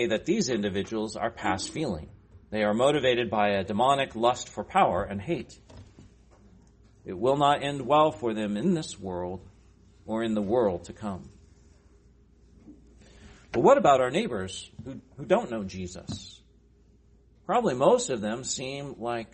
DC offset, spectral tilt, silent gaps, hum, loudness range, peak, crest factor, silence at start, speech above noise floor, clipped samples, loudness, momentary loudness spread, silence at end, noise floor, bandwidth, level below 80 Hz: under 0.1%; -5 dB/octave; none; none; 7 LU; -8 dBFS; 20 dB; 0 s; 33 dB; under 0.1%; -27 LUFS; 16 LU; 0.1 s; -59 dBFS; 8.8 kHz; -56 dBFS